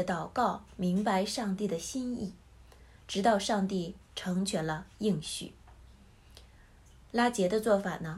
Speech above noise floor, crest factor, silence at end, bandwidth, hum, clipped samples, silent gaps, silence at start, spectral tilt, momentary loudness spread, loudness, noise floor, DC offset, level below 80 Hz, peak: 26 dB; 18 dB; 0 s; 13 kHz; none; under 0.1%; none; 0 s; -5 dB/octave; 11 LU; -32 LUFS; -57 dBFS; under 0.1%; -58 dBFS; -14 dBFS